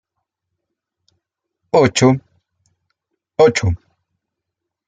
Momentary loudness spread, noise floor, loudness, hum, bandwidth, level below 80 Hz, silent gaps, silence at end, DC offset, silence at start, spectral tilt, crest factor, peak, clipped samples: 13 LU; -81 dBFS; -15 LUFS; none; 9.4 kHz; -48 dBFS; none; 1.1 s; under 0.1%; 1.75 s; -5.5 dB/octave; 18 dB; -2 dBFS; under 0.1%